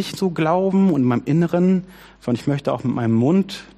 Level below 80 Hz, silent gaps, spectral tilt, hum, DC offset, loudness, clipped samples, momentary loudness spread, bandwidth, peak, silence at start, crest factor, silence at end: -54 dBFS; none; -8 dB/octave; none; under 0.1%; -19 LUFS; under 0.1%; 6 LU; 13.5 kHz; -6 dBFS; 0 s; 14 dB; 0.1 s